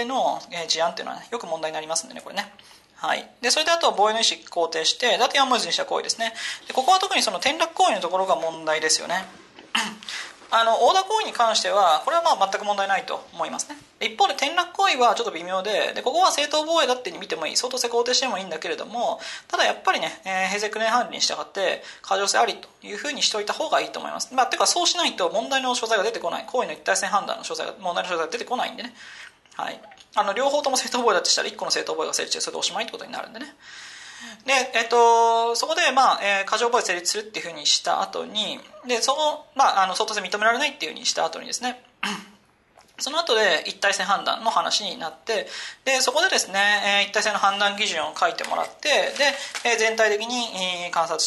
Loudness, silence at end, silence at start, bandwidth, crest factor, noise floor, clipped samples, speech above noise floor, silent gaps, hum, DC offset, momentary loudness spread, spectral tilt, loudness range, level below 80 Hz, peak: -22 LUFS; 0 s; 0 s; 12.5 kHz; 16 dB; -56 dBFS; under 0.1%; 33 dB; none; none; under 0.1%; 12 LU; -0.5 dB/octave; 4 LU; -72 dBFS; -6 dBFS